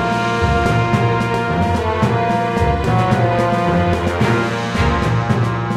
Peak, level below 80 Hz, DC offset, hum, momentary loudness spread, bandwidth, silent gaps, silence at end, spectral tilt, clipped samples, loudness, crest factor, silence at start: -2 dBFS; -30 dBFS; under 0.1%; none; 2 LU; 12 kHz; none; 0 s; -7 dB/octave; under 0.1%; -16 LUFS; 14 dB; 0 s